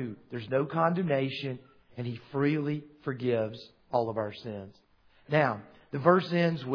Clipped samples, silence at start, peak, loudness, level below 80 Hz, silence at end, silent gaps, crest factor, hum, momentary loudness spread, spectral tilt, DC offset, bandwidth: under 0.1%; 0 s; -6 dBFS; -30 LUFS; -70 dBFS; 0 s; none; 24 dB; none; 16 LU; -8.5 dB/octave; under 0.1%; 5.4 kHz